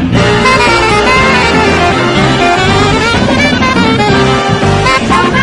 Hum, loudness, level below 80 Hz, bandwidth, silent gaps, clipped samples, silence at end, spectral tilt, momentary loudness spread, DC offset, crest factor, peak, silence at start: none; -8 LUFS; -26 dBFS; 11.5 kHz; none; 0.3%; 0 s; -5 dB/octave; 2 LU; under 0.1%; 8 dB; 0 dBFS; 0 s